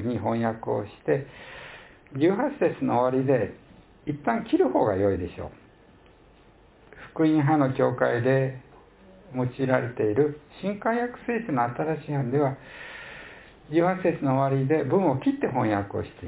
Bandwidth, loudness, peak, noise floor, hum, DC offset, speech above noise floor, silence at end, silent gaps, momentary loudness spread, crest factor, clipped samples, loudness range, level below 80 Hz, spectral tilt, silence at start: 4 kHz; -25 LUFS; -6 dBFS; -55 dBFS; none; under 0.1%; 30 dB; 0 s; none; 17 LU; 20 dB; under 0.1%; 3 LU; -54 dBFS; -11.5 dB/octave; 0 s